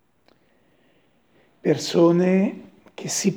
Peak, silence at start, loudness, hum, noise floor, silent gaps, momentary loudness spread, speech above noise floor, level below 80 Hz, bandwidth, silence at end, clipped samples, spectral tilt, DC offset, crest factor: -6 dBFS; 1.65 s; -21 LUFS; none; -62 dBFS; none; 15 LU; 43 dB; -74 dBFS; 19.5 kHz; 0 s; under 0.1%; -5.5 dB/octave; under 0.1%; 18 dB